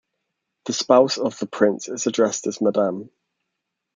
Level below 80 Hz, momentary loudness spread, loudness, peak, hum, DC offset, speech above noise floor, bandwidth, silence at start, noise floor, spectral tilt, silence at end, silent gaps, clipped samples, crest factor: -72 dBFS; 10 LU; -21 LUFS; 0 dBFS; none; under 0.1%; 60 dB; 9.4 kHz; 0.65 s; -80 dBFS; -4 dB/octave; 0.9 s; none; under 0.1%; 22 dB